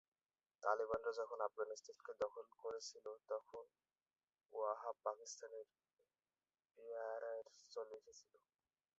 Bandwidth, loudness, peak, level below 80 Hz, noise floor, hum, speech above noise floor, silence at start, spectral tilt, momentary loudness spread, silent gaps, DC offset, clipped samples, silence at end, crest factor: 7.6 kHz; -48 LUFS; -24 dBFS; -86 dBFS; under -90 dBFS; none; over 42 dB; 0.6 s; -1 dB/octave; 16 LU; none; under 0.1%; under 0.1%; 0.8 s; 26 dB